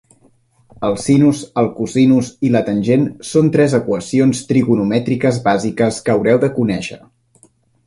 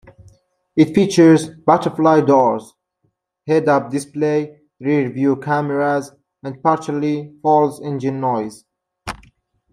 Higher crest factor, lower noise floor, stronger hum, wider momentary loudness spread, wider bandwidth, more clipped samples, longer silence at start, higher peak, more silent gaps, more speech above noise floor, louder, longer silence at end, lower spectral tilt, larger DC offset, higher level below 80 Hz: about the same, 14 dB vs 16 dB; second, -54 dBFS vs -68 dBFS; neither; second, 6 LU vs 19 LU; about the same, 11.5 kHz vs 12 kHz; neither; about the same, 0.8 s vs 0.75 s; about the same, 0 dBFS vs -2 dBFS; neither; second, 39 dB vs 52 dB; about the same, -15 LUFS vs -17 LUFS; first, 0.9 s vs 0.55 s; about the same, -6.5 dB/octave vs -7 dB/octave; neither; first, -50 dBFS vs -56 dBFS